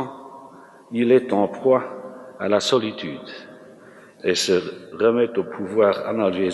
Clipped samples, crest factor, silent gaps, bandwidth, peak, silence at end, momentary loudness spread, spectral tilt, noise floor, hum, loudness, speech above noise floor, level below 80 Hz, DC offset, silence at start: under 0.1%; 18 dB; none; 12 kHz; -4 dBFS; 0 s; 18 LU; -4.5 dB/octave; -46 dBFS; none; -21 LUFS; 26 dB; -70 dBFS; under 0.1%; 0 s